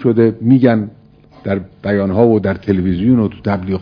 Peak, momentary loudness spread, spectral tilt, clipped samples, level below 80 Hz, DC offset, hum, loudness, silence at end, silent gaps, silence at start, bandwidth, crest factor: 0 dBFS; 10 LU; -11 dB/octave; under 0.1%; -42 dBFS; under 0.1%; none; -14 LUFS; 0 s; none; 0 s; 5.4 kHz; 14 dB